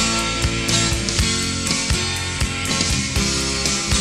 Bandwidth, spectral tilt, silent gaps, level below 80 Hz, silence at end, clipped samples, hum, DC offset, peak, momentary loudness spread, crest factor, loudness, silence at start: 16 kHz; -2.5 dB/octave; none; -28 dBFS; 0 s; under 0.1%; none; under 0.1%; -2 dBFS; 3 LU; 18 dB; -19 LUFS; 0 s